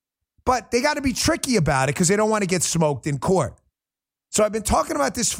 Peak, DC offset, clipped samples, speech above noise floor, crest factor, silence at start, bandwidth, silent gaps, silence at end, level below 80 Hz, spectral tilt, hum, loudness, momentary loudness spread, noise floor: -2 dBFS; under 0.1%; under 0.1%; 69 dB; 20 dB; 0.45 s; 16.5 kHz; none; 0 s; -42 dBFS; -4 dB/octave; none; -21 LUFS; 4 LU; -90 dBFS